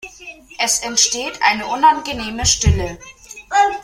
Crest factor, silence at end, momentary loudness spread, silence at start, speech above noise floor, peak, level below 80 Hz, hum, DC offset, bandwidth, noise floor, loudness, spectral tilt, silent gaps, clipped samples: 16 dB; 0 s; 21 LU; 0.05 s; 22 dB; -2 dBFS; -32 dBFS; none; under 0.1%; 16.5 kHz; -39 dBFS; -16 LUFS; -2 dB/octave; none; under 0.1%